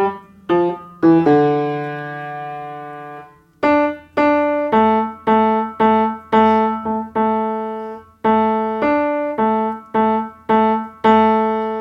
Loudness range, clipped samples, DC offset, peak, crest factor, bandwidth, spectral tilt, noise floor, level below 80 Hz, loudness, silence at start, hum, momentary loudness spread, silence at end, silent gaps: 3 LU; under 0.1%; under 0.1%; -2 dBFS; 16 dB; 6 kHz; -8.5 dB/octave; -39 dBFS; -52 dBFS; -17 LUFS; 0 s; none; 14 LU; 0 s; none